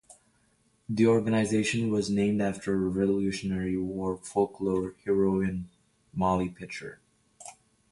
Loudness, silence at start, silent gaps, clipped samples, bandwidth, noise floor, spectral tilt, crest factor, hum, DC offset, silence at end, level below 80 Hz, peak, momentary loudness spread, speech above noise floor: -28 LUFS; 0.9 s; none; under 0.1%; 11.5 kHz; -68 dBFS; -6.5 dB/octave; 18 dB; none; under 0.1%; 0.4 s; -54 dBFS; -12 dBFS; 15 LU; 41 dB